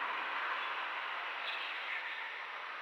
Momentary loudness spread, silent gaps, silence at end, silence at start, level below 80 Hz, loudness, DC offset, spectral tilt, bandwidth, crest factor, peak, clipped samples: 5 LU; none; 0 s; 0 s; under -90 dBFS; -38 LUFS; under 0.1%; 0 dB/octave; 19 kHz; 14 dB; -26 dBFS; under 0.1%